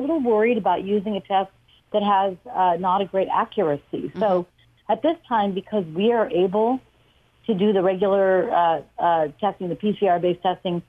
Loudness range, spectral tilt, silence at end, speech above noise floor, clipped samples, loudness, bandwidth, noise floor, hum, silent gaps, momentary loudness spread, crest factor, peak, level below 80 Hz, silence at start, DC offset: 2 LU; -8.5 dB/octave; 0.05 s; 38 dB; under 0.1%; -22 LUFS; 5.6 kHz; -59 dBFS; none; none; 7 LU; 14 dB; -8 dBFS; -60 dBFS; 0 s; under 0.1%